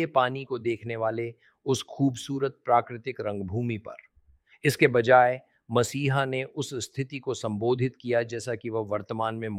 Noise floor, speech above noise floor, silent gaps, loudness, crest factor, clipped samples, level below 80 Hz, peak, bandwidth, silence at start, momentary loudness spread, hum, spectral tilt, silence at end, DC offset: -61 dBFS; 34 dB; none; -27 LUFS; 22 dB; under 0.1%; -66 dBFS; -4 dBFS; 16 kHz; 0 s; 11 LU; none; -5.5 dB/octave; 0 s; under 0.1%